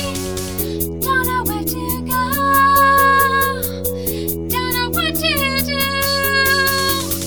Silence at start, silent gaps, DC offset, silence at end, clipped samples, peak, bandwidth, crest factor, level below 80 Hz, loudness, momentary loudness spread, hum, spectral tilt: 0 s; none; 1%; 0 s; under 0.1%; -2 dBFS; over 20 kHz; 16 dB; -36 dBFS; -16 LUFS; 10 LU; none; -3 dB/octave